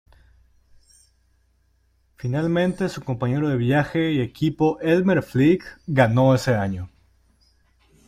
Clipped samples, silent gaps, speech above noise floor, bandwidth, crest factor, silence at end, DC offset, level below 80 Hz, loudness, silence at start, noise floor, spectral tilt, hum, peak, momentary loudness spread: under 0.1%; none; 43 dB; 14.5 kHz; 18 dB; 1.2 s; under 0.1%; -52 dBFS; -21 LUFS; 2.25 s; -63 dBFS; -7.5 dB/octave; none; -4 dBFS; 9 LU